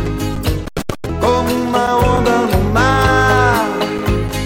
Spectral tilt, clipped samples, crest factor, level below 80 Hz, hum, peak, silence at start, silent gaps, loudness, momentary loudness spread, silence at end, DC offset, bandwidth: -5.5 dB/octave; under 0.1%; 14 dB; -24 dBFS; none; 0 dBFS; 0 s; none; -15 LUFS; 9 LU; 0 s; under 0.1%; 16.5 kHz